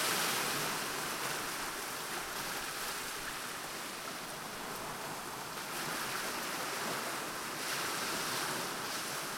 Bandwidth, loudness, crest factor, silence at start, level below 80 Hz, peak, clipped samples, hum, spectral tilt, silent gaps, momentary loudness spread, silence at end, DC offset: 16.5 kHz; -37 LUFS; 20 dB; 0 s; -66 dBFS; -18 dBFS; under 0.1%; none; -1.5 dB/octave; none; 7 LU; 0 s; under 0.1%